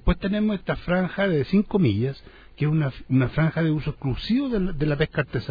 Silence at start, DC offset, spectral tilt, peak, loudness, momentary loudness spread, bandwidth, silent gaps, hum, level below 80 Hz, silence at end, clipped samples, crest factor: 0.05 s; under 0.1%; -9.5 dB/octave; -6 dBFS; -24 LUFS; 6 LU; 5 kHz; none; none; -36 dBFS; 0 s; under 0.1%; 16 dB